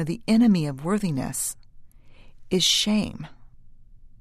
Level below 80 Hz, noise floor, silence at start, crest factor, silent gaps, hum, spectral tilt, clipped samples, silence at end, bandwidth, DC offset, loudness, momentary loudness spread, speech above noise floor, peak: -48 dBFS; -46 dBFS; 0 s; 18 dB; none; none; -4 dB/octave; under 0.1%; 0.15 s; 14 kHz; under 0.1%; -23 LUFS; 17 LU; 23 dB; -8 dBFS